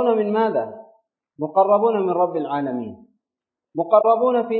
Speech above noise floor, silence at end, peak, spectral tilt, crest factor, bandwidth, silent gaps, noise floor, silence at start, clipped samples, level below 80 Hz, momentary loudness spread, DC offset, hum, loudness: 68 dB; 0 s; -2 dBFS; -11.5 dB/octave; 18 dB; 4.4 kHz; none; -87 dBFS; 0 s; under 0.1%; -72 dBFS; 15 LU; under 0.1%; none; -20 LUFS